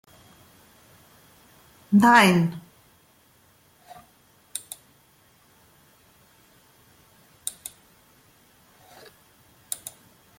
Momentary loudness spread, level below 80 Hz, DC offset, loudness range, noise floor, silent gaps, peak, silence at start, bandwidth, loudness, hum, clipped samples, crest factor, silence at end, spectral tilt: 27 LU; -68 dBFS; under 0.1%; 21 LU; -59 dBFS; none; -6 dBFS; 1.9 s; 17 kHz; -22 LUFS; none; under 0.1%; 24 dB; 0.65 s; -4.5 dB/octave